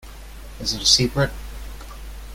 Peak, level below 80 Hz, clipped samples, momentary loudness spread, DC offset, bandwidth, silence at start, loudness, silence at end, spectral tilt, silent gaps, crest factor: -2 dBFS; -36 dBFS; under 0.1%; 25 LU; under 0.1%; 17 kHz; 0 s; -19 LUFS; 0 s; -3 dB/octave; none; 22 dB